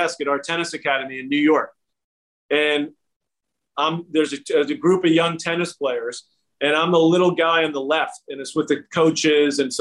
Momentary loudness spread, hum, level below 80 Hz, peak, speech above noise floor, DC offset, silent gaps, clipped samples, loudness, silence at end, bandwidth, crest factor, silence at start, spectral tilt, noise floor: 10 LU; none; -70 dBFS; -6 dBFS; 63 dB; under 0.1%; 2.04-2.49 s, 3.16-3.20 s; under 0.1%; -20 LUFS; 0 s; 11.5 kHz; 14 dB; 0 s; -4.5 dB/octave; -82 dBFS